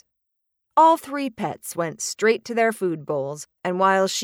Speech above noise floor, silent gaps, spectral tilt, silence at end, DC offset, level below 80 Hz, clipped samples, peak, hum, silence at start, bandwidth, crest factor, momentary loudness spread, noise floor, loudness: 56 dB; none; -4 dB/octave; 0 s; under 0.1%; -72 dBFS; under 0.1%; -4 dBFS; none; 0.75 s; 18 kHz; 18 dB; 12 LU; -78 dBFS; -22 LUFS